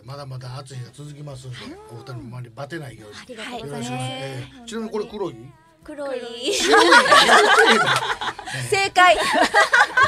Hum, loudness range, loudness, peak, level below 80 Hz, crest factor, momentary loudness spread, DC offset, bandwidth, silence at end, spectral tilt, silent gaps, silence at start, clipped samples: none; 20 LU; -16 LUFS; 0 dBFS; -54 dBFS; 20 dB; 24 LU; under 0.1%; 15.5 kHz; 0 s; -2.5 dB/octave; none; 0.05 s; under 0.1%